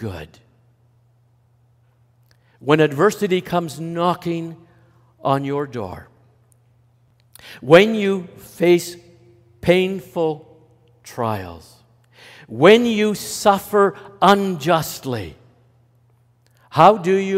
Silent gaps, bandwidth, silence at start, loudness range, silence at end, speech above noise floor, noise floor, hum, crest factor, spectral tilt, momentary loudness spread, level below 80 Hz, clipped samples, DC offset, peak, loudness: none; 16 kHz; 0 s; 8 LU; 0 s; 40 dB; -58 dBFS; none; 20 dB; -5.5 dB/octave; 21 LU; -58 dBFS; under 0.1%; under 0.1%; 0 dBFS; -18 LUFS